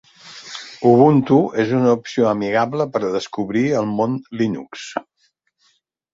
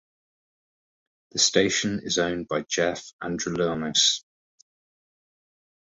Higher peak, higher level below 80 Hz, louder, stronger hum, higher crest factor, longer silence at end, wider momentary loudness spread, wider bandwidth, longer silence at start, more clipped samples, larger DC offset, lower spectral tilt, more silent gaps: first, -2 dBFS vs -6 dBFS; about the same, -60 dBFS vs -58 dBFS; first, -18 LUFS vs -24 LUFS; neither; about the same, 18 dB vs 22 dB; second, 1.15 s vs 1.65 s; first, 18 LU vs 11 LU; about the same, 7.8 kHz vs 8.4 kHz; second, 0.25 s vs 1.35 s; neither; neither; first, -7 dB/octave vs -2.5 dB/octave; second, none vs 3.13-3.19 s